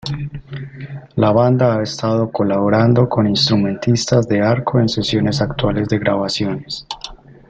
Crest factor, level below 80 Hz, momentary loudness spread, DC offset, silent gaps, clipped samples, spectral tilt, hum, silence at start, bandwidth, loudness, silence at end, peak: 14 dB; -42 dBFS; 16 LU; under 0.1%; none; under 0.1%; -6 dB/octave; none; 0.05 s; 8.6 kHz; -16 LUFS; 0.15 s; -2 dBFS